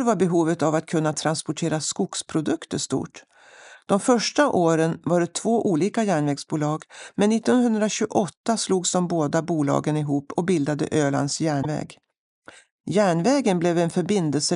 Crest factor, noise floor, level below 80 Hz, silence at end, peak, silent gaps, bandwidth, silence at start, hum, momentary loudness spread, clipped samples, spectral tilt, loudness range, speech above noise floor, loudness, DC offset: 18 dB; -48 dBFS; -66 dBFS; 0 s; -4 dBFS; 8.37-8.44 s, 12.18-12.42 s, 12.72-12.84 s; 11.5 kHz; 0 s; none; 7 LU; under 0.1%; -5 dB/octave; 3 LU; 26 dB; -23 LUFS; under 0.1%